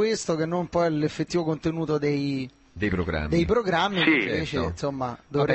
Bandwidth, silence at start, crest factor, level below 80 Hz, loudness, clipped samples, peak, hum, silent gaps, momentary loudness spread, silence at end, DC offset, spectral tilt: 8.6 kHz; 0 s; 18 dB; -42 dBFS; -25 LUFS; under 0.1%; -8 dBFS; none; none; 8 LU; 0 s; under 0.1%; -5.5 dB/octave